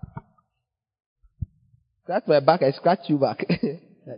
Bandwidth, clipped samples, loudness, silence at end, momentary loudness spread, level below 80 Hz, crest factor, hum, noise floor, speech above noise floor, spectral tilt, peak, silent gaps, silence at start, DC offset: 5.4 kHz; under 0.1%; -22 LUFS; 0 s; 22 LU; -52 dBFS; 24 dB; none; -82 dBFS; 60 dB; -11 dB/octave; 0 dBFS; 1.06-1.16 s; 0.15 s; under 0.1%